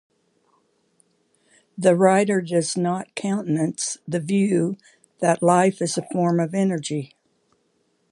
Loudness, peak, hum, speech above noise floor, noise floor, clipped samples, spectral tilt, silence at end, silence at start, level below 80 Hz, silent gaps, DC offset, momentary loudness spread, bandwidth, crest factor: -22 LUFS; -2 dBFS; none; 47 dB; -68 dBFS; under 0.1%; -5.5 dB/octave; 1.05 s; 1.75 s; -72 dBFS; none; under 0.1%; 10 LU; 11.5 kHz; 20 dB